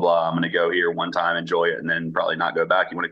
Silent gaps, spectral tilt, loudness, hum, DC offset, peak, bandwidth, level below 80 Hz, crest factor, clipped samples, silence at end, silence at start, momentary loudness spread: none; -6.5 dB/octave; -22 LUFS; none; under 0.1%; -6 dBFS; 7.6 kHz; -68 dBFS; 16 dB; under 0.1%; 0 s; 0 s; 3 LU